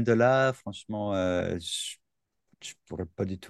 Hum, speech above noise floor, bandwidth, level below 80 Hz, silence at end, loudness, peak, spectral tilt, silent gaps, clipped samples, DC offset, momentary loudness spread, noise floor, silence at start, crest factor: none; 53 dB; 12.5 kHz; -60 dBFS; 0 s; -29 LUFS; -10 dBFS; -5 dB/octave; none; under 0.1%; under 0.1%; 21 LU; -81 dBFS; 0 s; 20 dB